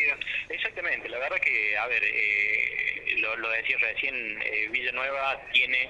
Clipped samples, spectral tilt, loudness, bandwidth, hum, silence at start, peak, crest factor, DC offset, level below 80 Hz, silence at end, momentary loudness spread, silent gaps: under 0.1%; -2.5 dB/octave; -26 LUFS; 10.5 kHz; 50 Hz at -60 dBFS; 0 s; -8 dBFS; 20 dB; under 0.1%; -60 dBFS; 0 s; 6 LU; none